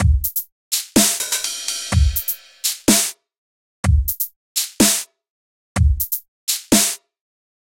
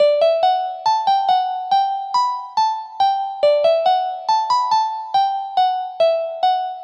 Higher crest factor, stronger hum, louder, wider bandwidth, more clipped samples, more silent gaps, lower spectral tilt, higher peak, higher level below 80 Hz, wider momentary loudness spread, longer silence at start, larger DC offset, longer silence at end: first, 18 dB vs 12 dB; neither; about the same, -18 LUFS vs -18 LUFS; first, 17 kHz vs 8.4 kHz; neither; first, 0.52-0.71 s, 3.38-3.83 s, 4.36-4.55 s, 5.30-5.75 s, 6.28-6.47 s vs none; first, -3.5 dB/octave vs -1 dB/octave; first, -2 dBFS vs -6 dBFS; first, -26 dBFS vs -74 dBFS; first, 9 LU vs 4 LU; about the same, 0 s vs 0 s; neither; first, 0.7 s vs 0 s